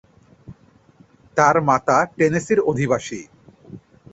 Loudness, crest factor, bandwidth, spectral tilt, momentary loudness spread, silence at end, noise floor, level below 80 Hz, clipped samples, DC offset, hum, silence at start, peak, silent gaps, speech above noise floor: -18 LUFS; 20 dB; 8.2 kHz; -6 dB/octave; 10 LU; 0.35 s; -53 dBFS; -56 dBFS; under 0.1%; under 0.1%; none; 0.5 s; -2 dBFS; none; 35 dB